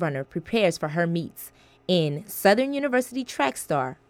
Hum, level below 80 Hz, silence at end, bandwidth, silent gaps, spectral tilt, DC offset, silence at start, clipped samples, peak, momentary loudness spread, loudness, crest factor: none; -62 dBFS; 0.15 s; 18 kHz; none; -5 dB/octave; under 0.1%; 0 s; under 0.1%; -6 dBFS; 13 LU; -25 LUFS; 18 dB